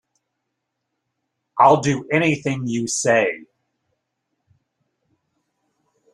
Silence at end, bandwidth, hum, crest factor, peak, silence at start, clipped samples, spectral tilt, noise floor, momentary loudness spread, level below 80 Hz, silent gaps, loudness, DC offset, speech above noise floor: 2.75 s; 13 kHz; none; 22 dB; -2 dBFS; 1.55 s; under 0.1%; -4.5 dB/octave; -78 dBFS; 10 LU; -64 dBFS; none; -18 LUFS; under 0.1%; 60 dB